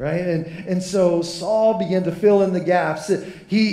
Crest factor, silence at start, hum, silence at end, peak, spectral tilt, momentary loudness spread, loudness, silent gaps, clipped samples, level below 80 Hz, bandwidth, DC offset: 14 dB; 0 s; none; 0 s; -4 dBFS; -6 dB/octave; 8 LU; -20 LUFS; none; under 0.1%; -56 dBFS; 13 kHz; under 0.1%